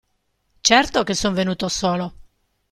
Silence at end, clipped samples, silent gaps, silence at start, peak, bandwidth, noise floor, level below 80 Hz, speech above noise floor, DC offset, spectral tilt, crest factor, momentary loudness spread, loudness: 0.5 s; under 0.1%; none; 0.65 s; -2 dBFS; 13 kHz; -69 dBFS; -46 dBFS; 50 dB; under 0.1%; -3 dB/octave; 20 dB; 9 LU; -19 LUFS